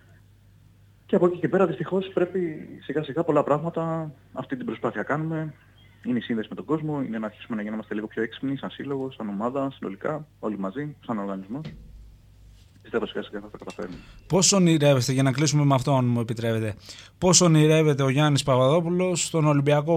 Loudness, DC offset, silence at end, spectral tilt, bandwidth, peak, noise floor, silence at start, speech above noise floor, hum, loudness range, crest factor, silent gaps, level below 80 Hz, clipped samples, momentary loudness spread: -24 LUFS; under 0.1%; 0 s; -5 dB/octave; 15.5 kHz; -4 dBFS; -55 dBFS; 1.1 s; 31 dB; none; 12 LU; 20 dB; none; -56 dBFS; under 0.1%; 16 LU